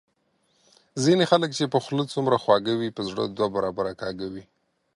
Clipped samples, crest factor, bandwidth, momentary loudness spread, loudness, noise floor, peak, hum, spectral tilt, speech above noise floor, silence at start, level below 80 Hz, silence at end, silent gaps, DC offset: under 0.1%; 22 dB; 11.5 kHz; 12 LU; -24 LUFS; -69 dBFS; -4 dBFS; none; -5.5 dB/octave; 45 dB; 0.95 s; -62 dBFS; 0.55 s; none; under 0.1%